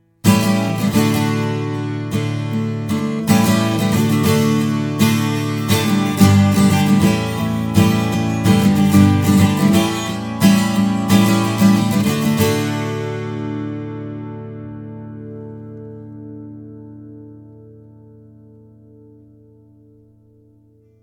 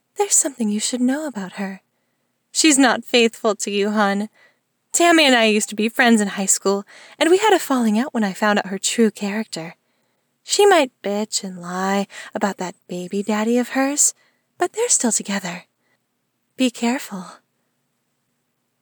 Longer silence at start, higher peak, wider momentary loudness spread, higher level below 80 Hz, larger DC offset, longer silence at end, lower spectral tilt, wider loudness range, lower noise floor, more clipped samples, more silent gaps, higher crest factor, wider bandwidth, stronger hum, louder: about the same, 0.25 s vs 0.2 s; first, 0 dBFS vs -4 dBFS; first, 20 LU vs 14 LU; first, -46 dBFS vs -82 dBFS; neither; first, 3.3 s vs 1.5 s; first, -6 dB/octave vs -2.5 dB/octave; first, 18 LU vs 6 LU; second, -52 dBFS vs -71 dBFS; neither; neither; about the same, 16 dB vs 16 dB; about the same, 19 kHz vs over 20 kHz; neither; about the same, -16 LUFS vs -18 LUFS